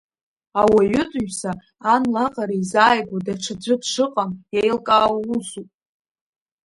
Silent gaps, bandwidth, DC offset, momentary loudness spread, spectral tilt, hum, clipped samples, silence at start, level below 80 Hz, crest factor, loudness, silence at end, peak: none; 11.5 kHz; under 0.1%; 11 LU; -4.5 dB/octave; none; under 0.1%; 0.55 s; -54 dBFS; 20 dB; -20 LUFS; 1 s; 0 dBFS